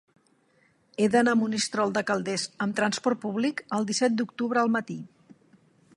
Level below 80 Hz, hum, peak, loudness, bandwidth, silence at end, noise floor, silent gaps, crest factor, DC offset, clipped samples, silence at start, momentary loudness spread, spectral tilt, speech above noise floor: -74 dBFS; none; -8 dBFS; -26 LUFS; 11.5 kHz; 0.9 s; -65 dBFS; none; 20 dB; under 0.1%; under 0.1%; 1 s; 7 LU; -4 dB/octave; 39 dB